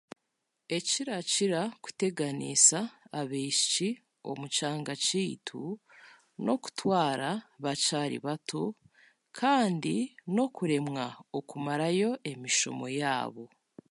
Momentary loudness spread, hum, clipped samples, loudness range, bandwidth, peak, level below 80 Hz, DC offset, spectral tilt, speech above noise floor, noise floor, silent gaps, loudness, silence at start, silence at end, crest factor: 12 LU; none; under 0.1%; 4 LU; 11.5 kHz; -6 dBFS; -80 dBFS; under 0.1%; -3 dB/octave; 52 dB; -82 dBFS; none; -30 LUFS; 0.7 s; 0.45 s; 24 dB